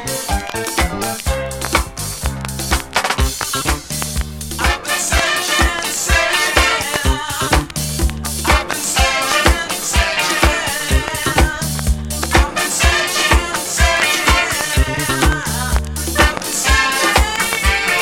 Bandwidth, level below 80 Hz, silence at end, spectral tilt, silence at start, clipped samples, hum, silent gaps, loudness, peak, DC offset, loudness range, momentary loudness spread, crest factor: 17 kHz; -22 dBFS; 0 s; -3 dB/octave; 0 s; under 0.1%; none; none; -16 LUFS; 0 dBFS; under 0.1%; 5 LU; 7 LU; 16 dB